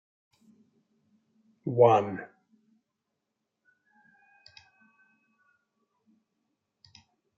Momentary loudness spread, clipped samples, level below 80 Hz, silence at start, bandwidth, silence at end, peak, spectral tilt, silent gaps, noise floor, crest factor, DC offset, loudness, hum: 21 LU; under 0.1%; -82 dBFS; 1.65 s; 7.2 kHz; 5.15 s; -6 dBFS; -6.5 dB/octave; none; -84 dBFS; 26 dB; under 0.1%; -25 LUFS; none